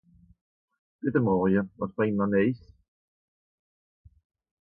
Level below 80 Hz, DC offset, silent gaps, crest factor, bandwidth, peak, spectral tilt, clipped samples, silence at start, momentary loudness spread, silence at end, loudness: -58 dBFS; under 0.1%; none; 18 dB; 4.7 kHz; -10 dBFS; -12 dB/octave; under 0.1%; 1.05 s; 10 LU; 2.05 s; -26 LUFS